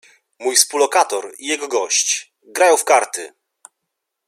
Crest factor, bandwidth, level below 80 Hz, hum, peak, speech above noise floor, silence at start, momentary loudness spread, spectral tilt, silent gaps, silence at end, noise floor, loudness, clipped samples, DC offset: 20 dB; 16 kHz; -76 dBFS; none; 0 dBFS; 61 dB; 0.4 s; 12 LU; 1.5 dB/octave; none; 1 s; -78 dBFS; -17 LUFS; under 0.1%; under 0.1%